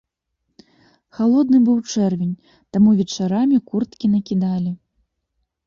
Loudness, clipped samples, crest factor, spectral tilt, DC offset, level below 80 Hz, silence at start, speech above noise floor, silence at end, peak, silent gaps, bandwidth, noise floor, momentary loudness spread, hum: -18 LUFS; under 0.1%; 14 dB; -7 dB/octave; under 0.1%; -58 dBFS; 1.2 s; 57 dB; 0.9 s; -6 dBFS; none; 7.4 kHz; -75 dBFS; 11 LU; none